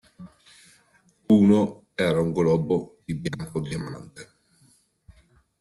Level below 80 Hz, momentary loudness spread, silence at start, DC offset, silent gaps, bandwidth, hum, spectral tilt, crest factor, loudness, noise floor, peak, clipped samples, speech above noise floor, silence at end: -56 dBFS; 16 LU; 0.2 s; under 0.1%; none; 12 kHz; none; -7.5 dB/octave; 18 dB; -23 LUFS; -62 dBFS; -8 dBFS; under 0.1%; 39 dB; 1.4 s